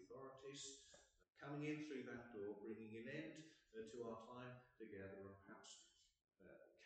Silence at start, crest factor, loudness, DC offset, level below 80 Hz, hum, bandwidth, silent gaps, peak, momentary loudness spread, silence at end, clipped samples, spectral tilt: 0 s; 18 dB; -55 LUFS; under 0.1%; -86 dBFS; none; 8.8 kHz; none; -38 dBFS; 12 LU; 0 s; under 0.1%; -5 dB/octave